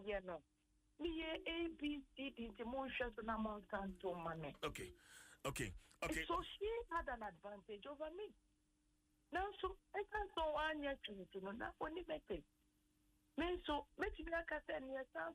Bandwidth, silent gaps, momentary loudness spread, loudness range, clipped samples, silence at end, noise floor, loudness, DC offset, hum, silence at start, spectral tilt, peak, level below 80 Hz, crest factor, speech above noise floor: 13 kHz; none; 9 LU; 2 LU; under 0.1%; 0 s; -81 dBFS; -47 LUFS; under 0.1%; none; 0 s; -4.5 dB/octave; -32 dBFS; -62 dBFS; 16 dB; 34 dB